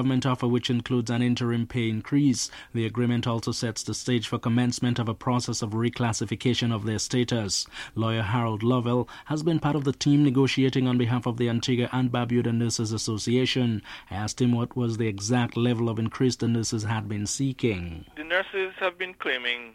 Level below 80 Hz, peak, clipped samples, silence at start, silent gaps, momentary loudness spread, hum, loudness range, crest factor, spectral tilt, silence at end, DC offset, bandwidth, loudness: -54 dBFS; -10 dBFS; under 0.1%; 0 s; none; 6 LU; none; 3 LU; 16 dB; -5.5 dB/octave; 0.05 s; under 0.1%; 13 kHz; -26 LUFS